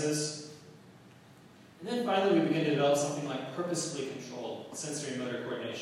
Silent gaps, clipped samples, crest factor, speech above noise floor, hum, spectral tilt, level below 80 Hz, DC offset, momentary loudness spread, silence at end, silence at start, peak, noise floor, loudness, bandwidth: none; under 0.1%; 18 dB; 24 dB; none; -4.5 dB/octave; -80 dBFS; under 0.1%; 13 LU; 0 s; 0 s; -16 dBFS; -56 dBFS; -32 LUFS; 14 kHz